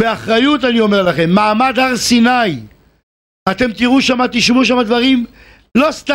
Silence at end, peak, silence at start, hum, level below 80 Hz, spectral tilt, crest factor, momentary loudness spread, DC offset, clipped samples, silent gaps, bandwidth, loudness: 0 s; 0 dBFS; 0 s; none; -44 dBFS; -4.5 dB/octave; 12 dB; 7 LU; under 0.1%; under 0.1%; 3.03-3.46 s; 15.5 kHz; -12 LUFS